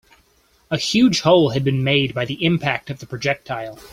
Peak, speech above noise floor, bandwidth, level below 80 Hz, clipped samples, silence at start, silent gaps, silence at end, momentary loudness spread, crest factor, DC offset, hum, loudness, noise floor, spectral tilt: -2 dBFS; 40 dB; 15.5 kHz; -52 dBFS; under 0.1%; 0.7 s; none; 0.05 s; 12 LU; 18 dB; under 0.1%; none; -19 LUFS; -58 dBFS; -5.5 dB/octave